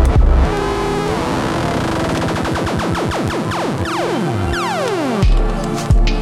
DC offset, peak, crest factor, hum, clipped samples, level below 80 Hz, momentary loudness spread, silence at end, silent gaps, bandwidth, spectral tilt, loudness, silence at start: under 0.1%; -2 dBFS; 14 dB; none; under 0.1%; -18 dBFS; 3 LU; 0 s; none; 14 kHz; -6 dB/octave; -18 LUFS; 0 s